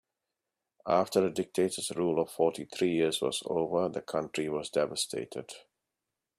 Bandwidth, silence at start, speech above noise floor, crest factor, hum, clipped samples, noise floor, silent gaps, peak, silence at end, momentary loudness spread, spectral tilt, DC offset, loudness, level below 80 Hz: 15 kHz; 0.85 s; 57 dB; 20 dB; none; under 0.1%; -88 dBFS; none; -12 dBFS; 0.8 s; 10 LU; -4 dB/octave; under 0.1%; -31 LUFS; -70 dBFS